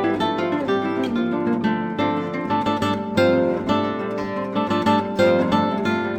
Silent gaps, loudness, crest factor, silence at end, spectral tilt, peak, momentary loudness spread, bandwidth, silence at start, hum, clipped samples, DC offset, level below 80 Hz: none; -21 LUFS; 16 dB; 0 s; -6.5 dB/octave; -6 dBFS; 6 LU; 18 kHz; 0 s; none; under 0.1%; under 0.1%; -54 dBFS